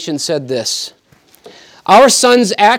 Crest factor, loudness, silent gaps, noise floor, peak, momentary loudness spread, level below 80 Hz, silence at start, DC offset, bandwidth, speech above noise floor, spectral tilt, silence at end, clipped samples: 12 dB; -11 LUFS; none; -48 dBFS; 0 dBFS; 15 LU; -60 dBFS; 0 s; under 0.1%; 17 kHz; 37 dB; -2.5 dB/octave; 0 s; under 0.1%